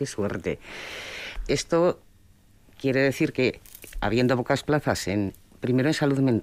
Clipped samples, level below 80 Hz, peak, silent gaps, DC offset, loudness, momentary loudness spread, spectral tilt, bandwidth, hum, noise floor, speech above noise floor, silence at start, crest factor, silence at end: under 0.1%; -46 dBFS; -10 dBFS; none; under 0.1%; -26 LUFS; 12 LU; -5.5 dB/octave; 16 kHz; none; -56 dBFS; 31 dB; 0 s; 14 dB; 0 s